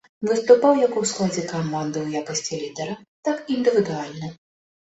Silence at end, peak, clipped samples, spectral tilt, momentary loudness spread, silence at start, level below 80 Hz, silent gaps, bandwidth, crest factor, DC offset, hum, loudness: 0.55 s; -2 dBFS; under 0.1%; -5 dB/octave; 15 LU; 0.2 s; -64 dBFS; 3.08-3.23 s; 8.2 kHz; 20 dB; under 0.1%; none; -22 LUFS